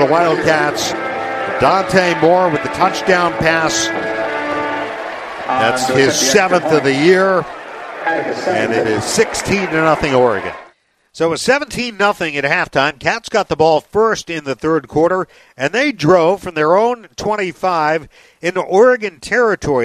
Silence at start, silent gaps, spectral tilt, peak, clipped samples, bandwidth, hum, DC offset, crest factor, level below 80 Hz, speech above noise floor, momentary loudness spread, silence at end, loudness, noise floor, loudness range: 0 s; none; -4 dB/octave; 0 dBFS; under 0.1%; 15 kHz; none; under 0.1%; 14 dB; -46 dBFS; 36 dB; 9 LU; 0 s; -15 LUFS; -50 dBFS; 2 LU